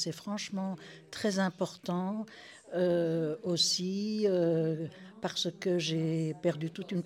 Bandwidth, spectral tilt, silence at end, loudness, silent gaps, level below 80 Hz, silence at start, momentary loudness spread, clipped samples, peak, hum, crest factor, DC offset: 15.5 kHz; -5 dB/octave; 0 s; -32 LUFS; none; -78 dBFS; 0 s; 11 LU; under 0.1%; -16 dBFS; none; 16 dB; under 0.1%